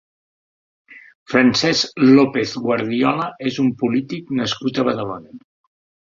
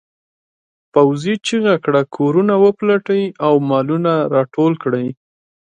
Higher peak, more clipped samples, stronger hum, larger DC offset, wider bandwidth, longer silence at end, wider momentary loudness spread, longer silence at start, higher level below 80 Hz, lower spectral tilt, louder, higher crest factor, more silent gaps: about the same, -2 dBFS vs 0 dBFS; neither; neither; neither; second, 7.6 kHz vs 9.6 kHz; about the same, 0.75 s vs 0.65 s; first, 11 LU vs 6 LU; about the same, 0.9 s vs 0.95 s; first, -58 dBFS vs -64 dBFS; second, -5 dB/octave vs -7 dB/octave; about the same, -18 LUFS vs -16 LUFS; about the same, 18 dB vs 16 dB; first, 1.15-1.26 s vs none